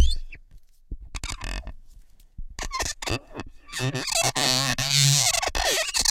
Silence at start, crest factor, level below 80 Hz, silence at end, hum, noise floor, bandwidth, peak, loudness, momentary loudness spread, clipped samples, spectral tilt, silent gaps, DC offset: 0 s; 20 dB; -34 dBFS; 0 s; none; -49 dBFS; 17 kHz; -6 dBFS; -23 LUFS; 20 LU; under 0.1%; -2 dB/octave; none; under 0.1%